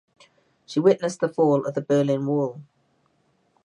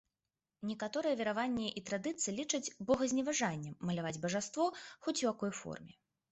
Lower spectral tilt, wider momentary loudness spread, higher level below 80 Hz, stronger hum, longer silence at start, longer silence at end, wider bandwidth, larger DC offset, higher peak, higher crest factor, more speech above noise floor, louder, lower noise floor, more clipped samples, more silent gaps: first, -7 dB/octave vs -4 dB/octave; about the same, 8 LU vs 9 LU; second, -76 dBFS vs -70 dBFS; neither; about the same, 0.7 s vs 0.6 s; first, 1.05 s vs 0.45 s; first, 11 kHz vs 8.2 kHz; neither; first, -4 dBFS vs -20 dBFS; about the same, 20 dB vs 18 dB; second, 45 dB vs over 53 dB; first, -23 LUFS vs -37 LUFS; second, -66 dBFS vs under -90 dBFS; neither; neither